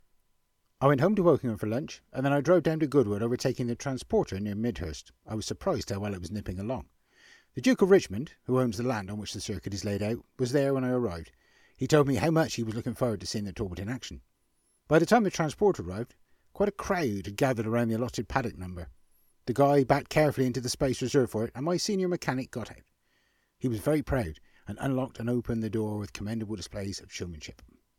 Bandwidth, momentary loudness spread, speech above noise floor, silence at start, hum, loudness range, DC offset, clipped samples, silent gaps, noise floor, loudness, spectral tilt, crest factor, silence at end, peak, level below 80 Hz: 16.5 kHz; 14 LU; 43 dB; 0.8 s; none; 6 LU; under 0.1%; under 0.1%; none; -72 dBFS; -29 LUFS; -6 dB/octave; 20 dB; 0.45 s; -8 dBFS; -52 dBFS